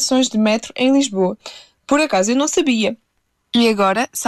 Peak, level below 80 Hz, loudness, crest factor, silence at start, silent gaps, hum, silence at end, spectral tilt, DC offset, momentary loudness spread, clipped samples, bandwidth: -4 dBFS; -58 dBFS; -17 LUFS; 12 dB; 0 s; none; none; 0 s; -3.5 dB/octave; under 0.1%; 11 LU; under 0.1%; 12.5 kHz